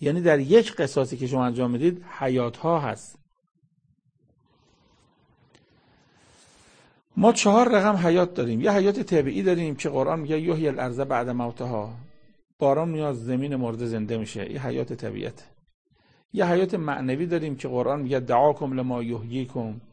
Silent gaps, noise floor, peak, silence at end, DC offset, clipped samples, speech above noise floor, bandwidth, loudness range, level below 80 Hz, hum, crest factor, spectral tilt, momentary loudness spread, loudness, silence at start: 12.53-12.59 s, 15.74-15.85 s, 16.25-16.29 s; -67 dBFS; -4 dBFS; 0.1 s; under 0.1%; under 0.1%; 44 dB; 9.8 kHz; 9 LU; -60 dBFS; none; 20 dB; -6 dB/octave; 12 LU; -24 LUFS; 0 s